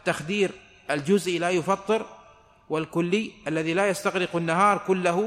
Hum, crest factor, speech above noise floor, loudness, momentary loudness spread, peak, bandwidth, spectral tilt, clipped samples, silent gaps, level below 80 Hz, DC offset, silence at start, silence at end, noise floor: none; 16 dB; 29 dB; -25 LUFS; 9 LU; -8 dBFS; 15 kHz; -5 dB/octave; under 0.1%; none; -64 dBFS; under 0.1%; 0.05 s; 0 s; -54 dBFS